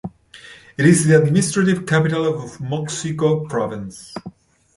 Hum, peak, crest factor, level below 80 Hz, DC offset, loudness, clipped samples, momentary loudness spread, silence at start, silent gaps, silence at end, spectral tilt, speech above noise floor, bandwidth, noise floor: none; -2 dBFS; 18 dB; -54 dBFS; under 0.1%; -18 LUFS; under 0.1%; 20 LU; 0.05 s; none; 0.45 s; -5.5 dB/octave; 25 dB; 11.5 kHz; -43 dBFS